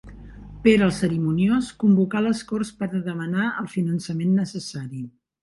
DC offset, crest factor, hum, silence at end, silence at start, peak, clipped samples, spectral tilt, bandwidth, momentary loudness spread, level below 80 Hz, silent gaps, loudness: under 0.1%; 20 dB; none; 0.35 s; 0.05 s; -4 dBFS; under 0.1%; -7 dB/octave; 11.5 kHz; 14 LU; -50 dBFS; none; -23 LUFS